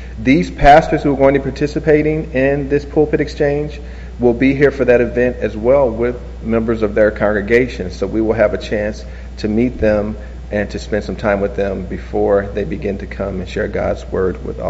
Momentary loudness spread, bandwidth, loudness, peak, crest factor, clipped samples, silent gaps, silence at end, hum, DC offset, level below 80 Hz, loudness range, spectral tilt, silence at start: 10 LU; 8 kHz; -16 LUFS; 0 dBFS; 16 dB; under 0.1%; none; 0 s; none; under 0.1%; -28 dBFS; 5 LU; -6 dB/octave; 0 s